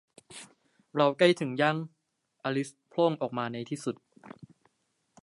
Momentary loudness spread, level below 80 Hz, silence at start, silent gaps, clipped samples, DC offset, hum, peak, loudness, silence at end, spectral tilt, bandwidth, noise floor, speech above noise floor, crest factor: 23 LU; -80 dBFS; 0.3 s; none; under 0.1%; under 0.1%; none; -8 dBFS; -29 LUFS; 0.95 s; -5.5 dB/octave; 11.5 kHz; -76 dBFS; 48 dB; 24 dB